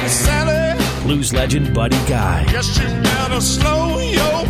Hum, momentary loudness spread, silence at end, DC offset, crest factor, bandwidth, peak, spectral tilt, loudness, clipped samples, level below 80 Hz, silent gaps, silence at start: none; 2 LU; 0 s; under 0.1%; 14 dB; 16 kHz; -2 dBFS; -4.5 dB/octave; -16 LUFS; under 0.1%; -24 dBFS; none; 0 s